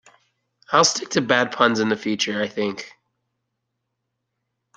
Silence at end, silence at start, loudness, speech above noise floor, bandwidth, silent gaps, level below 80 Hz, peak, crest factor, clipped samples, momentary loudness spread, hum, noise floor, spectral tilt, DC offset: 1.9 s; 0.7 s; -20 LUFS; 57 dB; 10 kHz; none; -68 dBFS; -2 dBFS; 22 dB; under 0.1%; 10 LU; none; -78 dBFS; -3 dB/octave; under 0.1%